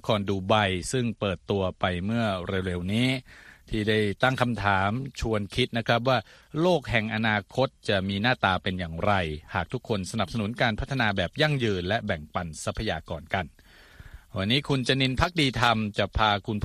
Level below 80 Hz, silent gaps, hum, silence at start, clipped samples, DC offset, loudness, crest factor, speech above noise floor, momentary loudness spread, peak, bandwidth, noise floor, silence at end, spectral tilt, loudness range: -46 dBFS; none; none; 0.05 s; under 0.1%; under 0.1%; -26 LUFS; 22 dB; 23 dB; 8 LU; -4 dBFS; 14 kHz; -49 dBFS; 0 s; -5.5 dB/octave; 3 LU